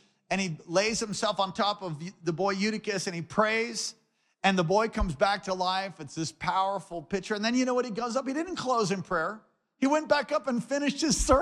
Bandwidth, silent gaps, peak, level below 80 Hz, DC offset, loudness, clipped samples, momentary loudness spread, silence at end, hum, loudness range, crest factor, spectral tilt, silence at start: 13.5 kHz; none; -10 dBFS; -46 dBFS; under 0.1%; -29 LUFS; under 0.1%; 8 LU; 0 s; none; 2 LU; 20 dB; -4 dB/octave; 0.3 s